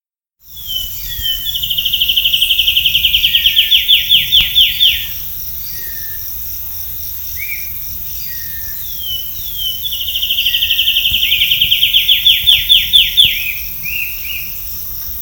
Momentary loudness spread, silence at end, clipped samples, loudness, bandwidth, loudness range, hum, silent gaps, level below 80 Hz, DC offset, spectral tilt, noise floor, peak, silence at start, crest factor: 12 LU; 0 s; 0.1%; -11 LUFS; over 20 kHz; 11 LU; none; none; -36 dBFS; under 0.1%; 1 dB/octave; -47 dBFS; 0 dBFS; 0.45 s; 14 dB